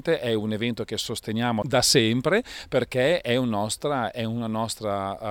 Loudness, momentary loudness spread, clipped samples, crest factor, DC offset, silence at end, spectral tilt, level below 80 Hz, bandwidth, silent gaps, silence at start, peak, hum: -25 LUFS; 9 LU; under 0.1%; 18 dB; under 0.1%; 0 s; -4 dB/octave; -54 dBFS; 18 kHz; none; 0.05 s; -6 dBFS; none